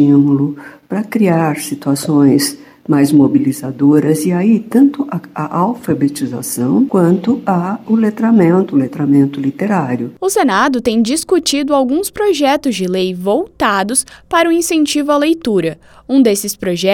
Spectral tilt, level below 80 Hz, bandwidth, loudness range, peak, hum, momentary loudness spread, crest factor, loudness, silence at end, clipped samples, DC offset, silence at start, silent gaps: -5.5 dB/octave; -50 dBFS; 17 kHz; 2 LU; 0 dBFS; none; 8 LU; 12 dB; -14 LUFS; 0 s; under 0.1%; under 0.1%; 0 s; none